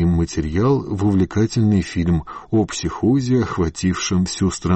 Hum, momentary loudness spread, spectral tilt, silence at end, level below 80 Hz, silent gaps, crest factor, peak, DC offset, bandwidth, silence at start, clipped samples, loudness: none; 4 LU; -6 dB/octave; 0 s; -36 dBFS; none; 10 dB; -8 dBFS; under 0.1%; 8.8 kHz; 0 s; under 0.1%; -19 LUFS